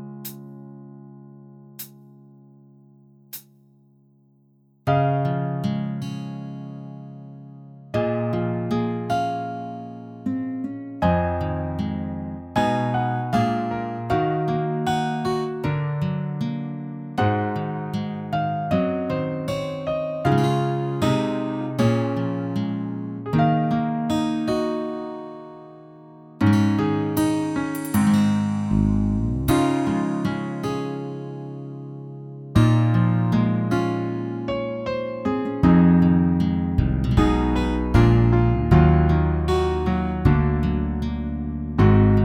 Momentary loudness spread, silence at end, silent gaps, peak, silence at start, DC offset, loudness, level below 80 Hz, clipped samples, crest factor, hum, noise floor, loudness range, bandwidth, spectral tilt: 17 LU; 0 s; none; -4 dBFS; 0 s; under 0.1%; -22 LUFS; -34 dBFS; under 0.1%; 18 dB; none; -59 dBFS; 8 LU; 18 kHz; -8 dB/octave